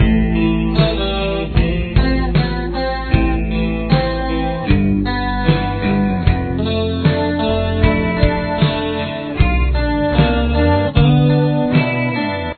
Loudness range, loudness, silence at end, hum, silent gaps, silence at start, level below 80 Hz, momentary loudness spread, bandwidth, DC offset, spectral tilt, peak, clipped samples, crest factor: 2 LU; -16 LUFS; 0.05 s; none; none; 0 s; -22 dBFS; 5 LU; 4.6 kHz; under 0.1%; -10.5 dB/octave; 0 dBFS; under 0.1%; 16 dB